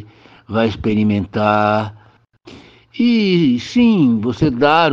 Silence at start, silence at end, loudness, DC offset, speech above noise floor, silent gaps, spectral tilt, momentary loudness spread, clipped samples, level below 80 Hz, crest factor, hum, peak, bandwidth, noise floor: 0 s; 0 s; -15 LUFS; under 0.1%; 32 dB; none; -7 dB/octave; 7 LU; under 0.1%; -44 dBFS; 16 dB; none; 0 dBFS; 7.2 kHz; -46 dBFS